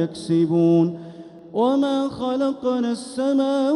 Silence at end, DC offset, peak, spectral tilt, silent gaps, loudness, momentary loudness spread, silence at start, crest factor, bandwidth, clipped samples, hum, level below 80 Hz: 0 s; under 0.1%; -8 dBFS; -7.5 dB/octave; none; -21 LUFS; 11 LU; 0 s; 12 dB; 11 kHz; under 0.1%; none; -62 dBFS